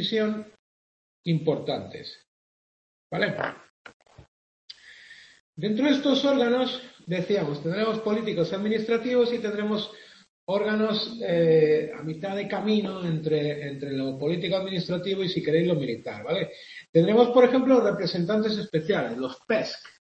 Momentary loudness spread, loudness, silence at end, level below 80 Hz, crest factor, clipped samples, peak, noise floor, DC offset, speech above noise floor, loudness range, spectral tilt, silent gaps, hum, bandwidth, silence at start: 13 LU; -25 LUFS; 0.2 s; -68 dBFS; 22 dB; under 0.1%; -4 dBFS; -50 dBFS; under 0.1%; 25 dB; 9 LU; -7 dB/octave; 0.59-1.24 s, 2.27-3.10 s, 3.70-3.85 s, 3.94-4.00 s, 4.28-4.68 s, 5.40-5.53 s, 10.29-10.47 s, 16.89-16.93 s; none; 8.2 kHz; 0 s